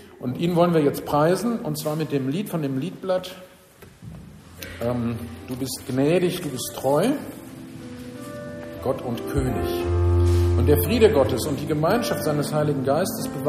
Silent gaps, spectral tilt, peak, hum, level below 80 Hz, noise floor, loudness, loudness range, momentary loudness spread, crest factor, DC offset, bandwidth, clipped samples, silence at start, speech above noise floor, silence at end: none; -6.5 dB/octave; -4 dBFS; none; -40 dBFS; -48 dBFS; -23 LUFS; 8 LU; 18 LU; 20 dB; under 0.1%; 15.5 kHz; under 0.1%; 0 s; 26 dB; 0 s